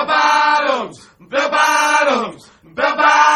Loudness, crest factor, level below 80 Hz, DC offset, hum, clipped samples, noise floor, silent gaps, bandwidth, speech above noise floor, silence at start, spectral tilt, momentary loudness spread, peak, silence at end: -14 LUFS; 14 dB; -62 dBFS; under 0.1%; none; under 0.1%; -38 dBFS; none; 13 kHz; 22 dB; 0 s; -1 dB/octave; 12 LU; 0 dBFS; 0 s